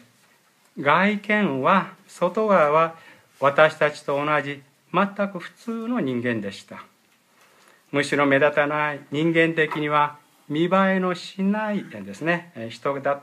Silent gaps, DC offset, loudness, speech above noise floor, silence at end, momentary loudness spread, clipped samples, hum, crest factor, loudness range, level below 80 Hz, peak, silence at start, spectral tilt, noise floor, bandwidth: none; under 0.1%; -22 LUFS; 38 dB; 0 s; 13 LU; under 0.1%; none; 20 dB; 6 LU; -76 dBFS; -2 dBFS; 0.75 s; -6 dB/octave; -60 dBFS; 14 kHz